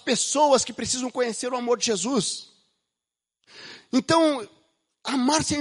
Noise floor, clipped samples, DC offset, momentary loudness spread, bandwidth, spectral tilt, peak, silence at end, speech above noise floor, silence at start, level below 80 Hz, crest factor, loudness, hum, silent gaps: -88 dBFS; under 0.1%; under 0.1%; 16 LU; 11.5 kHz; -3 dB/octave; -6 dBFS; 0 s; 65 dB; 0.05 s; -60 dBFS; 18 dB; -23 LUFS; none; none